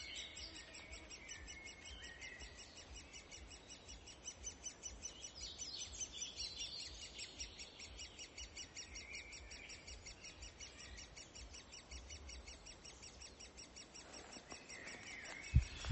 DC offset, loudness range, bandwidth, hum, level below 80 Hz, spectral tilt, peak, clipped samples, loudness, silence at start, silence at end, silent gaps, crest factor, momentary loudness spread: under 0.1%; 7 LU; 8.2 kHz; none; -54 dBFS; -2.5 dB/octave; -18 dBFS; under 0.1%; -50 LUFS; 0 s; 0 s; none; 32 dB; 10 LU